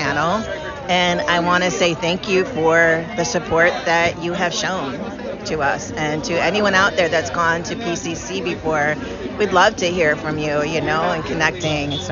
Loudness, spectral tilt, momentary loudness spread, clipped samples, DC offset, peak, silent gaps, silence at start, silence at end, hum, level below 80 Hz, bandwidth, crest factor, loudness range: -18 LUFS; -2.5 dB/octave; 9 LU; under 0.1%; under 0.1%; -2 dBFS; none; 0 s; 0 s; none; -44 dBFS; 7.4 kHz; 18 dB; 2 LU